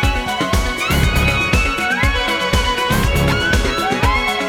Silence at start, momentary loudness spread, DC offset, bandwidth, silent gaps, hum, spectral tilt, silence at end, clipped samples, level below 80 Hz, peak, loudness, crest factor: 0 s; 3 LU; under 0.1%; 19.5 kHz; none; none; -4.5 dB/octave; 0 s; under 0.1%; -22 dBFS; 0 dBFS; -16 LUFS; 16 dB